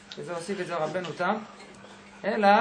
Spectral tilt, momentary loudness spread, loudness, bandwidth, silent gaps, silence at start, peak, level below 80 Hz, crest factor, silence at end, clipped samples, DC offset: -5 dB/octave; 22 LU; -29 LUFS; 10 kHz; none; 0 s; -6 dBFS; -70 dBFS; 22 dB; 0 s; under 0.1%; under 0.1%